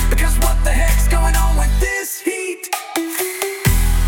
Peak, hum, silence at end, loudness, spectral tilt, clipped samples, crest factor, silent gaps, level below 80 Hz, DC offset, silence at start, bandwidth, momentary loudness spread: -2 dBFS; none; 0 s; -18 LUFS; -4 dB/octave; under 0.1%; 12 dB; none; -16 dBFS; under 0.1%; 0 s; 17 kHz; 6 LU